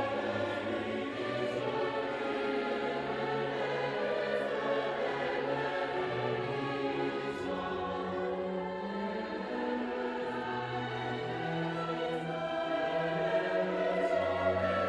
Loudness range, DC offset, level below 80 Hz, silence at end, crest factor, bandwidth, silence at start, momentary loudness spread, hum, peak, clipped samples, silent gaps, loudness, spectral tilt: 3 LU; under 0.1%; -66 dBFS; 0 s; 14 dB; 11 kHz; 0 s; 5 LU; none; -20 dBFS; under 0.1%; none; -34 LUFS; -6.5 dB/octave